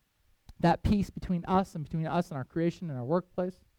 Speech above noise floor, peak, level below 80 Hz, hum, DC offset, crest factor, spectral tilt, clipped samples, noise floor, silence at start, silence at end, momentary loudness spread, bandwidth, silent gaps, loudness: 30 dB; -12 dBFS; -48 dBFS; none; under 0.1%; 18 dB; -8 dB/octave; under 0.1%; -60 dBFS; 0.6 s; 0.3 s; 7 LU; 13 kHz; none; -31 LUFS